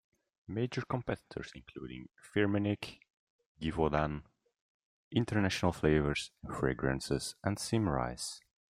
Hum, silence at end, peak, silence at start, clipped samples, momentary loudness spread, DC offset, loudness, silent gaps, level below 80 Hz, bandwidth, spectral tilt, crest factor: none; 0.35 s; -14 dBFS; 0.5 s; under 0.1%; 15 LU; under 0.1%; -34 LUFS; 3.10-3.39 s, 3.46-3.55 s, 4.61-5.11 s; -52 dBFS; 15.5 kHz; -5.5 dB/octave; 22 dB